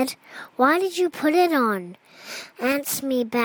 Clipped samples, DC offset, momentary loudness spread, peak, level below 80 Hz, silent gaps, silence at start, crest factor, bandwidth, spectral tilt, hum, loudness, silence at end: under 0.1%; under 0.1%; 18 LU; -8 dBFS; -70 dBFS; none; 0 s; 16 dB; 19.5 kHz; -3.5 dB/octave; none; -22 LUFS; 0 s